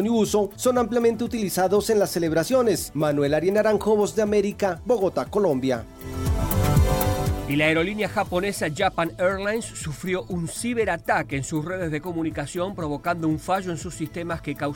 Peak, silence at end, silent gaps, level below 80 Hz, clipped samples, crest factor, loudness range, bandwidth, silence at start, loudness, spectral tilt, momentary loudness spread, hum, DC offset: -8 dBFS; 0 s; none; -36 dBFS; under 0.1%; 16 dB; 5 LU; 17 kHz; 0 s; -24 LUFS; -5.5 dB/octave; 8 LU; none; under 0.1%